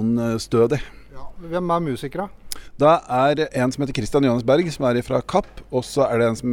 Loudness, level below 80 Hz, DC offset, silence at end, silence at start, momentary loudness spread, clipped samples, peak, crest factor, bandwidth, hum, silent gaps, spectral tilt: -21 LUFS; -44 dBFS; under 0.1%; 0 s; 0 s; 12 LU; under 0.1%; -4 dBFS; 16 dB; 17 kHz; none; none; -6.5 dB/octave